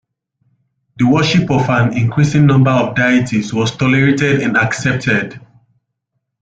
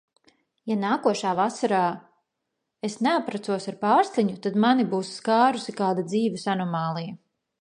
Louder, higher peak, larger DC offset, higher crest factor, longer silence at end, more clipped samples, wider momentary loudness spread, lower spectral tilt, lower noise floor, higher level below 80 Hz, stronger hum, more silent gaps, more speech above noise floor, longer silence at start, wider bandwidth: first, -13 LUFS vs -25 LUFS; first, -2 dBFS vs -6 dBFS; neither; about the same, 14 dB vs 18 dB; first, 1.05 s vs 0.45 s; neither; second, 6 LU vs 9 LU; about the same, -6.5 dB/octave vs -5.5 dB/octave; second, -72 dBFS vs -81 dBFS; first, -46 dBFS vs -76 dBFS; neither; neither; about the same, 59 dB vs 57 dB; first, 0.95 s vs 0.65 s; second, 9 kHz vs 10.5 kHz